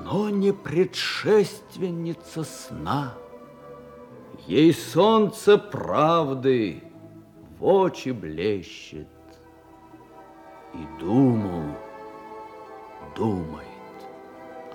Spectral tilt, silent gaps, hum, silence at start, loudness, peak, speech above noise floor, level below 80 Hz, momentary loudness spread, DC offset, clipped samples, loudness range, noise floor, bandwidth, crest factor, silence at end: -6.5 dB/octave; none; none; 0 s; -23 LUFS; -6 dBFS; 27 dB; -60 dBFS; 23 LU; under 0.1%; under 0.1%; 9 LU; -50 dBFS; 17.5 kHz; 20 dB; 0 s